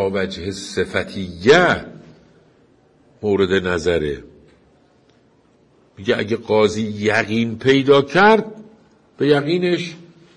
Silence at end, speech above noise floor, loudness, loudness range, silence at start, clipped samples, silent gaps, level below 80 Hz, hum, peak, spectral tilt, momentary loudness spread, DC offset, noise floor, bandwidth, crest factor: 0.35 s; 38 dB; -18 LUFS; 7 LU; 0 s; under 0.1%; none; -52 dBFS; none; -2 dBFS; -5.5 dB/octave; 14 LU; under 0.1%; -55 dBFS; 11 kHz; 18 dB